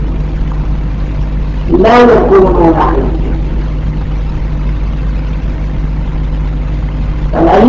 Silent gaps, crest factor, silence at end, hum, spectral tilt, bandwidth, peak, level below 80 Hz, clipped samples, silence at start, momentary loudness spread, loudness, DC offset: none; 10 dB; 0 s; none; -8.5 dB/octave; 7 kHz; 0 dBFS; -14 dBFS; 1%; 0 s; 12 LU; -12 LUFS; under 0.1%